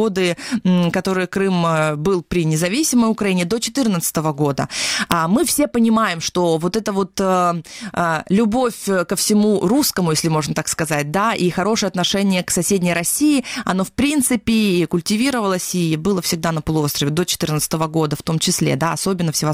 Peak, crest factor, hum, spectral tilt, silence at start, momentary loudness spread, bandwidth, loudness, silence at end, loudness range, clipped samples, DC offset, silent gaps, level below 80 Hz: 0 dBFS; 18 dB; none; -4.5 dB/octave; 0 s; 4 LU; 17 kHz; -18 LUFS; 0 s; 1 LU; under 0.1%; under 0.1%; none; -46 dBFS